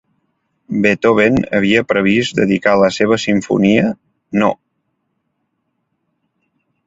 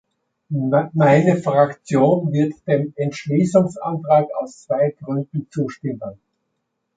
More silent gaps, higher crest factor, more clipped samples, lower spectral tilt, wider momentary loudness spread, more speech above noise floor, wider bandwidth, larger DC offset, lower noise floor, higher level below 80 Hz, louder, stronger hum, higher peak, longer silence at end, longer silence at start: neither; about the same, 16 dB vs 18 dB; neither; second, -6 dB/octave vs -8 dB/octave; second, 8 LU vs 12 LU; about the same, 56 dB vs 56 dB; second, 7.8 kHz vs 9.2 kHz; neither; second, -69 dBFS vs -74 dBFS; first, -48 dBFS vs -62 dBFS; first, -14 LUFS vs -19 LUFS; neither; about the same, 0 dBFS vs -2 dBFS; first, 2.35 s vs 0.8 s; first, 0.7 s vs 0.5 s